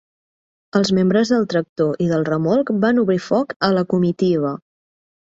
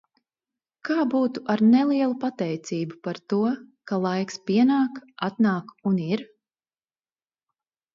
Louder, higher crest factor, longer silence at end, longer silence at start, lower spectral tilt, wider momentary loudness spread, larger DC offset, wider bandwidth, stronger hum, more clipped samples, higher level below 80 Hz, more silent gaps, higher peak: first, -18 LUFS vs -24 LUFS; about the same, 16 dB vs 16 dB; second, 0.7 s vs 1.7 s; about the same, 0.75 s vs 0.85 s; about the same, -6.5 dB/octave vs -7 dB/octave; second, 5 LU vs 11 LU; neither; about the same, 7.8 kHz vs 7.4 kHz; neither; neither; first, -58 dBFS vs -74 dBFS; first, 1.69-1.76 s, 3.56-3.60 s vs none; first, -2 dBFS vs -10 dBFS